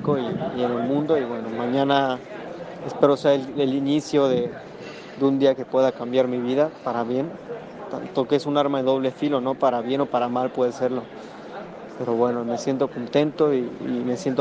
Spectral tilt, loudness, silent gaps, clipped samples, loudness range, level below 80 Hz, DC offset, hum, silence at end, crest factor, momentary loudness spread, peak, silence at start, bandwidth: -6.5 dB/octave; -23 LUFS; none; under 0.1%; 3 LU; -66 dBFS; under 0.1%; none; 0 s; 20 dB; 15 LU; -2 dBFS; 0 s; 9 kHz